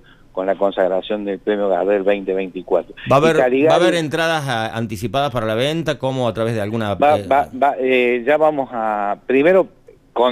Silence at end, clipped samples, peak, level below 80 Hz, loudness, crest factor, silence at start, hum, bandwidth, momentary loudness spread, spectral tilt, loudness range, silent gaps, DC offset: 0 s; under 0.1%; -2 dBFS; -50 dBFS; -18 LUFS; 14 dB; 0.35 s; none; 15 kHz; 8 LU; -6 dB/octave; 3 LU; none; under 0.1%